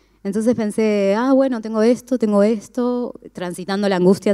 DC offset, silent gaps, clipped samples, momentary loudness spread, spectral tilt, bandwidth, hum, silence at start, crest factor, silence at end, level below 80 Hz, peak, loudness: under 0.1%; none; under 0.1%; 10 LU; -6.5 dB/octave; 13.5 kHz; none; 0.25 s; 14 dB; 0 s; -60 dBFS; -4 dBFS; -18 LUFS